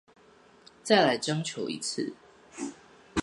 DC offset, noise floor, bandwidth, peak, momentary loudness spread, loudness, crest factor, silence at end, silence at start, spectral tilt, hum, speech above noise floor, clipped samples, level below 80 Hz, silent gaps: under 0.1%; -58 dBFS; 11.5 kHz; -8 dBFS; 17 LU; -29 LUFS; 24 dB; 0 s; 0.85 s; -4 dB/octave; none; 31 dB; under 0.1%; -62 dBFS; none